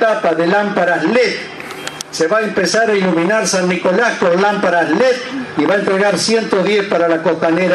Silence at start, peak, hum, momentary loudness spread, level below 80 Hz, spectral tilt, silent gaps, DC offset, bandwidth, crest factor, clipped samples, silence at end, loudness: 0 s; 0 dBFS; none; 6 LU; -60 dBFS; -4 dB/octave; none; under 0.1%; 13 kHz; 14 dB; under 0.1%; 0 s; -14 LUFS